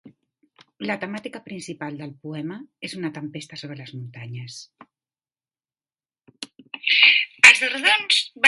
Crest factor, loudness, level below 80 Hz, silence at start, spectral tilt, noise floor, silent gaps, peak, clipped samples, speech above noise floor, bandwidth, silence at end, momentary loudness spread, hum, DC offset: 24 dB; -15 LUFS; -74 dBFS; 0.05 s; -1.5 dB/octave; under -90 dBFS; none; 0 dBFS; under 0.1%; over 64 dB; 11.5 kHz; 0 s; 25 LU; none; under 0.1%